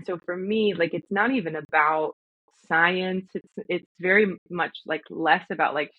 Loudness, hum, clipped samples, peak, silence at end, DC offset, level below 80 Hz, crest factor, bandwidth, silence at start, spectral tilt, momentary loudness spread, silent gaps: -24 LUFS; none; under 0.1%; -6 dBFS; 0.1 s; under 0.1%; -72 dBFS; 20 dB; 7.4 kHz; 0 s; -7.5 dB/octave; 11 LU; 1.65-1.69 s, 2.13-2.48 s, 3.86-3.95 s, 4.38-4.46 s